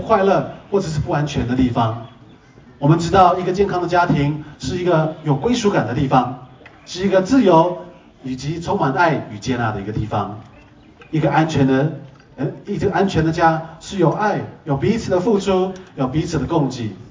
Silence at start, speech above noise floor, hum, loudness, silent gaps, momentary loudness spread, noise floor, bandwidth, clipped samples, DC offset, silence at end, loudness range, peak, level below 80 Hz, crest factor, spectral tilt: 0 s; 28 dB; none; -18 LUFS; none; 12 LU; -45 dBFS; 7.6 kHz; under 0.1%; under 0.1%; 0 s; 4 LU; 0 dBFS; -40 dBFS; 18 dB; -6.5 dB/octave